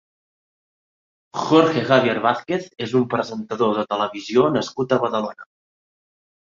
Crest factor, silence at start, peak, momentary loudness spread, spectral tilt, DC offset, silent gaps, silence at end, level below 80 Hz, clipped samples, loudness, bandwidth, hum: 20 dB; 1.35 s; -2 dBFS; 10 LU; -6 dB/octave; under 0.1%; none; 1.15 s; -64 dBFS; under 0.1%; -20 LUFS; 7.6 kHz; none